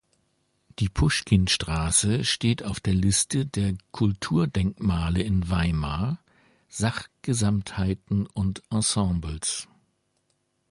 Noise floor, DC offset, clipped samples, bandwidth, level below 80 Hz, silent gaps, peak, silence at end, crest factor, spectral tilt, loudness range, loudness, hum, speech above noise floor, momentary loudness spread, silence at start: -73 dBFS; under 0.1%; under 0.1%; 11.5 kHz; -38 dBFS; none; -6 dBFS; 1.05 s; 20 dB; -4.5 dB/octave; 4 LU; -25 LUFS; none; 48 dB; 8 LU; 0.8 s